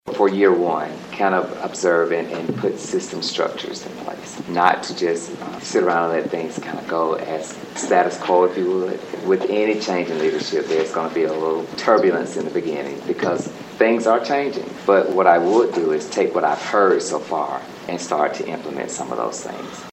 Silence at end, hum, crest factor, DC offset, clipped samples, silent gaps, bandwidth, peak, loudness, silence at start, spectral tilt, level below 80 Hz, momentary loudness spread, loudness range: 0 s; none; 20 dB; under 0.1%; under 0.1%; none; 10 kHz; 0 dBFS; -20 LUFS; 0.05 s; -4.5 dB/octave; -66 dBFS; 12 LU; 5 LU